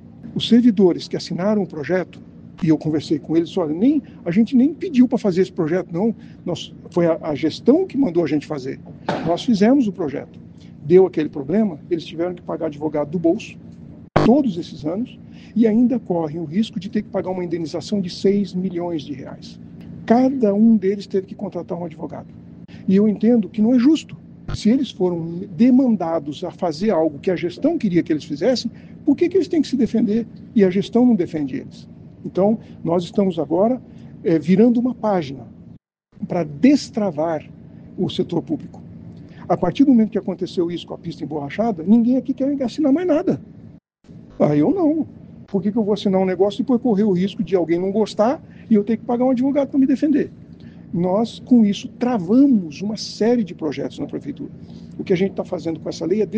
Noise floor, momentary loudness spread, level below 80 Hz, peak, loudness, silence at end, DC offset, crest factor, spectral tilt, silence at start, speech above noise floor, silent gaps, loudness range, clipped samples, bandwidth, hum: -47 dBFS; 14 LU; -52 dBFS; 0 dBFS; -19 LUFS; 0 s; under 0.1%; 20 dB; -7.5 dB/octave; 0.05 s; 29 dB; none; 3 LU; under 0.1%; 8.4 kHz; none